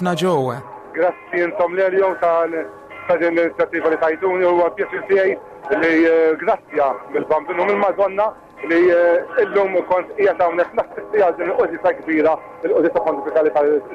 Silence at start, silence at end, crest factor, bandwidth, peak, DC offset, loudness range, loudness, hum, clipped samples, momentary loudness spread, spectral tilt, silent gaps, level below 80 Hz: 0 s; 0 s; 10 dB; 10 kHz; -8 dBFS; under 0.1%; 1 LU; -18 LUFS; none; under 0.1%; 8 LU; -6.5 dB/octave; none; -58 dBFS